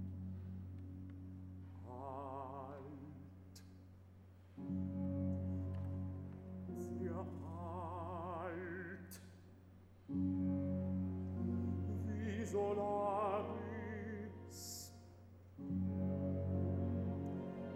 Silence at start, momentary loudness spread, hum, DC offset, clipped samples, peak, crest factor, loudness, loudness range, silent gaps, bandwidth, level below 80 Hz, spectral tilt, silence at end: 0 s; 19 LU; none; under 0.1%; under 0.1%; -28 dBFS; 16 dB; -44 LUFS; 10 LU; none; 14.5 kHz; -66 dBFS; -7.5 dB/octave; 0 s